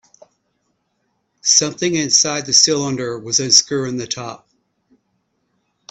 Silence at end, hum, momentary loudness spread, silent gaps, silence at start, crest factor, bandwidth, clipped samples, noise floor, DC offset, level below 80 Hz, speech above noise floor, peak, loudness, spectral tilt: 1.55 s; none; 13 LU; none; 1.45 s; 20 dB; 16 kHz; under 0.1%; -69 dBFS; under 0.1%; -62 dBFS; 51 dB; 0 dBFS; -15 LUFS; -1.5 dB/octave